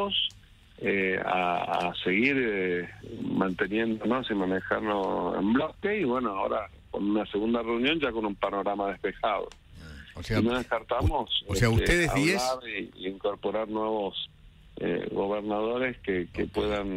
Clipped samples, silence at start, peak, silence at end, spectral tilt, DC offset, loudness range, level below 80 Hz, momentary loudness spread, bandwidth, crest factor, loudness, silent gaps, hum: under 0.1%; 0 s; -10 dBFS; 0 s; -5.5 dB/octave; under 0.1%; 4 LU; -44 dBFS; 9 LU; 16 kHz; 20 dB; -28 LUFS; none; none